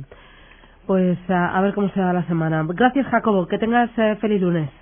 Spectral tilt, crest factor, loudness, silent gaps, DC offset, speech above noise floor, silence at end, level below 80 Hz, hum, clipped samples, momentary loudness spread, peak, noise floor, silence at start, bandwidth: -11.5 dB/octave; 18 dB; -20 LUFS; none; under 0.1%; 28 dB; 0.1 s; -50 dBFS; none; under 0.1%; 3 LU; -2 dBFS; -47 dBFS; 0 s; 3.6 kHz